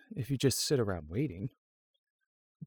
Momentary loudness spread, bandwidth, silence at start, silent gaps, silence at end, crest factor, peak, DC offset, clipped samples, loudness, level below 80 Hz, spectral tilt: 11 LU; over 20 kHz; 0.1 s; 1.58-2.19 s, 2.26-2.60 s; 0 s; 20 dB; -14 dBFS; under 0.1%; under 0.1%; -32 LUFS; -58 dBFS; -5 dB/octave